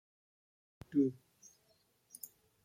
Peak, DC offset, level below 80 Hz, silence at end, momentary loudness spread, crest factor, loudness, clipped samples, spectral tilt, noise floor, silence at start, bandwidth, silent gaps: -22 dBFS; under 0.1%; -78 dBFS; 1.5 s; 23 LU; 20 dB; -36 LUFS; under 0.1%; -7 dB/octave; -74 dBFS; 0.9 s; 15.5 kHz; none